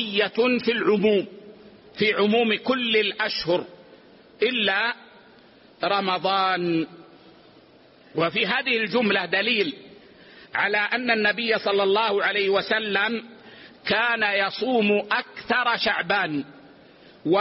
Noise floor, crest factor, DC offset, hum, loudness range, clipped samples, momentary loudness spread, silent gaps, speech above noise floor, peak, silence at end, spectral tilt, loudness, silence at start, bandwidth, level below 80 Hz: -53 dBFS; 16 dB; under 0.1%; none; 3 LU; under 0.1%; 8 LU; none; 30 dB; -8 dBFS; 0 s; -1.5 dB/octave; -23 LUFS; 0 s; 6 kHz; -66 dBFS